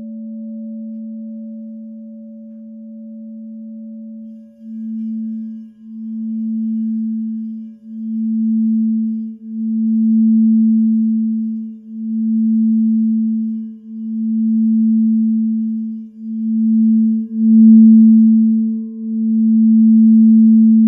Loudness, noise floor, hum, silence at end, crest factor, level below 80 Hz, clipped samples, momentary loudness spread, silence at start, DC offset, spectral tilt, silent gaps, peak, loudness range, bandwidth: -14 LUFS; -35 dBFS; 60 Hz at -70 dBFS; 0 s; 14 dB; -76 dBFS; under 0.1%; 23 LU; 0 s; under 0.1%; -14.5 dB/octave; none; -2 dBFS; 20 LU; 0.6 kHz